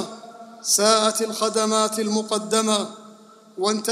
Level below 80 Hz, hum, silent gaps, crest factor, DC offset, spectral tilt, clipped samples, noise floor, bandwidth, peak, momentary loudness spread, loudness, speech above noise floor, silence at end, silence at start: -78 dBFS; none; none; 20 dB; under 0.1%; -2.5 dB/octave; under 0.1%; -48 dBFS; 15.5 kHz; -4 dBFS; 17 LU; -21 LUFS; 27 dB; 0 s; 0 s